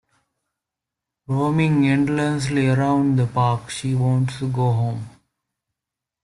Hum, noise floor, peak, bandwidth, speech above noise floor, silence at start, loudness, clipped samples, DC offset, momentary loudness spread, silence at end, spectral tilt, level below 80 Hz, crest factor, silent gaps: none; -86 dBFS; -6 dBFS; 11.5 kHz; 66 dB; 1.3 s; -20 LUFS; under 0.1%; under 0.1%; 8 LU; 1.15 s; -7 dB/octave; -54 dBFS; 16 dB; none